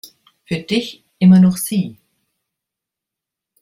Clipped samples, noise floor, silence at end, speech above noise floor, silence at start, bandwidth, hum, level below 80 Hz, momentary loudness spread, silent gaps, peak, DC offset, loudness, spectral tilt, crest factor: under 0.1%; -84 dBFS; 1.7 s; 70 dB; 0.5 s; 15.5 kHz; none; -58 dBFS; 16 LU; none; -2 dBFS; under 0.1%; -15 LUFS; -6.5 dB/octave; 16 dB